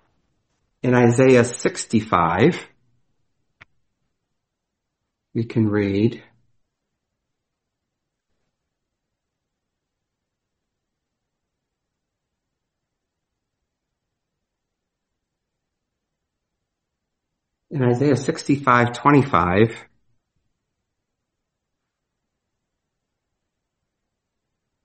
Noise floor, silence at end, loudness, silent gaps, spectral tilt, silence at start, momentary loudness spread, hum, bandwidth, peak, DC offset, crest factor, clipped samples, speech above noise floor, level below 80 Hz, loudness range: -81 dBFS; 5 s; -18 LUFS; none; -6.5 dB/octave; 0.85 s; 11 LU; none; 8.4 kHz; 0 dBFS; under 0.1%; 24 dB; under 0.1%; 63 dB; -58 dBFS; 9 LU